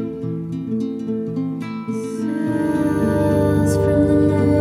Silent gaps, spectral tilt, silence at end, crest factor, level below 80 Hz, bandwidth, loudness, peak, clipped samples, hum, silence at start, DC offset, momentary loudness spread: none; -8 dB/octave; 0 s; 14 dB; -38 dBFS; 14.5 kHz; -20 LUFS; -4 dBFS; under 0.1%; none; 0 s; under 0.1%; 10 LU